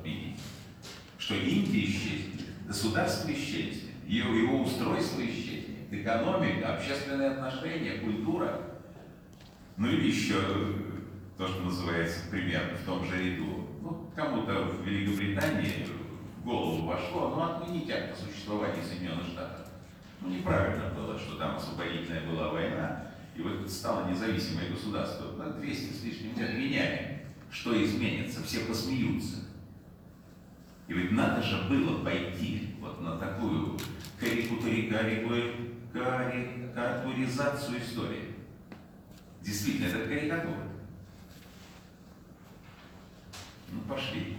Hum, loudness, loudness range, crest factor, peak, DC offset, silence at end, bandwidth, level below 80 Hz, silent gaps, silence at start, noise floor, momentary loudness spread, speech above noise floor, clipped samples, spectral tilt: none; -33 LUFS; 4 LU; 18 dB; -14 dBFS; under 0.1%; 0 s; over 20 kHz; -56 dBFS; none; 0 s; -53 dBFS; 20 LU; 21 dB; under 0.1%; -5.5 dB/octave